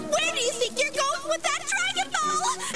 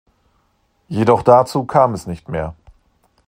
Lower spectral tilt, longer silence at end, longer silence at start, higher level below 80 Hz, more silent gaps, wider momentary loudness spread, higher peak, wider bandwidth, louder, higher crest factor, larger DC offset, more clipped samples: second, -0.5 dB/octave vs -7 dB/octave; second, 0 s vs 0.75 s; second, 0 s vs 0.9 s; second, -62 dBFS vs -46 dBFS; neither; second, 2 LU vs 15 LU; second, -12 dBFS vs 0 dBFS; second, 11 kHz vs 16 kHz; second, -25 LUFS vs -16 LUFS; about the same, 16 dB vs 18 dB; first, 0.6% vs under 0.1%; neither